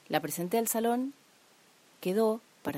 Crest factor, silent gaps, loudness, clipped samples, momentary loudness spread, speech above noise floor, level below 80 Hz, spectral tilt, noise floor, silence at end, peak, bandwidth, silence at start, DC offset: 22 dB; none; -31 LUFS; under 0.1%; 8 LU; 32 dB; -76 dBFS; -4.5 dB/octave; -62 dBFS; 0 s; -10 dBFS; 16 kHz; 0.1 s; under 0.1%